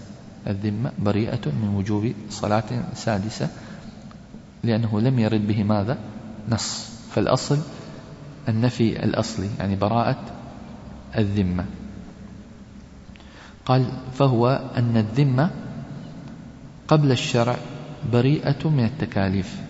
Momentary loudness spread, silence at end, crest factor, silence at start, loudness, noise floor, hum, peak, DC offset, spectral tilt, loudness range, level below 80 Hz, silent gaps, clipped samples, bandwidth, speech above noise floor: 21 LU; 0 s; 20 dB; 0 s; -23 LUFS; -44 dBFS; none; -4 dBFS; under 0.1%; -6.5 dB/octave; 4 LU; -48 dBFS; none; under 0.1%; 8 kHz; 22 dB